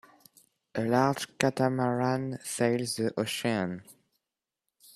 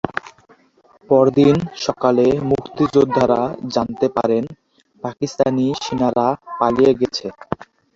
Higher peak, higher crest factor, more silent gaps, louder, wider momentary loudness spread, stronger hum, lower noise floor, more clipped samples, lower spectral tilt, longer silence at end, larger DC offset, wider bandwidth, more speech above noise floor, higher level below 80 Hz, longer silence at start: about the same, -4 dBFS vs -2 dBFS; first, 26 dB vs 16 dB; neither; second, -29 LUFS vs -18 LUFS; second, 8 LU vs 14 LU; neither; first, -89 dBFS vs -54 dBFS; neither; second, -5 dB/octave vs -6.5 dB/octave; first, 1.05 s vs 0.3 s; neither; first, 14.5 kHz vs 7.6 kHz; first, 60 dB vs 37 dB; second, -70 dBFS vs -50 dBFS; first, 0.75 s vs 0.05 s